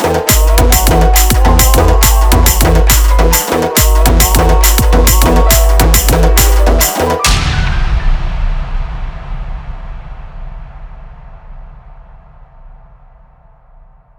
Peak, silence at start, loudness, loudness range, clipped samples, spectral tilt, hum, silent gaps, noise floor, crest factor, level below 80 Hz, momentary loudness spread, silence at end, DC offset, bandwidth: 0 dBFS; 0 s; -10 LUFS; 17 LU; under 0.1%; -4 dB/octave; none; none; -42 dBFS; 10 dB; -12 dBFS; 18 LU; 1.5 s; under 0.1%; over 20 kHz